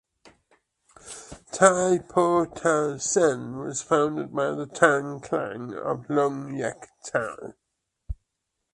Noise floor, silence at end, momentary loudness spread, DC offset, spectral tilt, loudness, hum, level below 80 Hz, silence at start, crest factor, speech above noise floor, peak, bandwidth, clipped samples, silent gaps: -81 dBFS; 0.6 s; 21 LU; under 0.1%; -4.5 dB/octave; -25 LUFS; none; -52 dBFS; 1.05 s; 24 dB; 56 dB; -2 dBFS; 11.5 kHz; under 0.1%; none